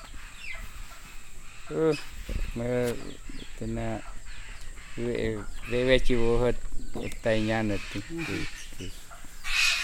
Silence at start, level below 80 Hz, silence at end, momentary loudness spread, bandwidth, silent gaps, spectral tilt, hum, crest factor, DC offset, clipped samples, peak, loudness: 0 s; -36 dBFS; 0 s; 21 LU; 15.5 kHz; none; -4.5 dB/octave; none; 20 dB; under 0.1%; under 0.1%; -8 dBFS; -30 LUFS